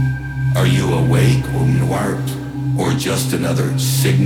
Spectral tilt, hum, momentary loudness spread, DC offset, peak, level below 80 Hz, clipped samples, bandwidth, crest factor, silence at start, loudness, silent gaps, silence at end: -6 dB/octave; none; 7 LU; under 0.1%; -2 dBFS; -36 dBFS; under 0.1%; 16.5 kHz; 14 dB; 0 s; -17 LUFS; none; 0 s